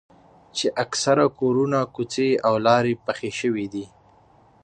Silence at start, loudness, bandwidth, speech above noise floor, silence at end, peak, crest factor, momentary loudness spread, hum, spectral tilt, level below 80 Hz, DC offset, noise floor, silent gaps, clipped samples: 0.55 s; -22 LUFS; 9.6 kHz; 33 dB; 0.75 s; -4 dBFS; 18 dB; 11 LU; none; -4.5 dB/octave; -62 dBFS; under 0.1%; -55 dBFS; none; under 0.1%